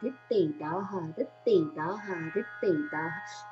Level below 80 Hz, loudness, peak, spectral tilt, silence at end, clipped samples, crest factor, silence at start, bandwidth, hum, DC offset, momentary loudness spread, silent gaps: -82 dBFS; -31 LUFS; -14 dBFS; -7 dB/octave; 0 s; under 0.1%; 16 dB; 0 s; 7.8 kHz; none; under 0.1%; 9 LU; none